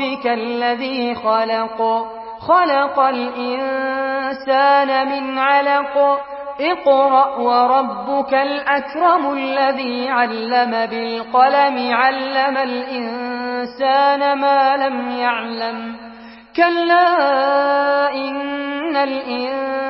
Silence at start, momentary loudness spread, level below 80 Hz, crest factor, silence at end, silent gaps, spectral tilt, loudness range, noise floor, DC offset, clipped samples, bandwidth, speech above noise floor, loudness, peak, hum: 0 s; 10 LU; -60 dBFS; 16 dB; 0 s; none; -8.5 dB/octave; 2 LU; -38 dBFS; under 0.1%; under 0.1%; 5.8 kHz; 21 dB; -17 LUFS; -2 dBFS; none